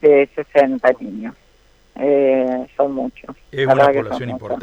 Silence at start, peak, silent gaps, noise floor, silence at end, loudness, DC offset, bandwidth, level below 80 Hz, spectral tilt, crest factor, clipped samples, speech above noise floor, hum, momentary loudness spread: 0.05 s; -2 dBFS; none; -44 dBFS; 0 s; -17 LUFS; under 0.1%; 8 kHz; -52 dBFS; -7.5 dB/octave; 14 dB; under 0.1%; 27 dB; none; 15 LU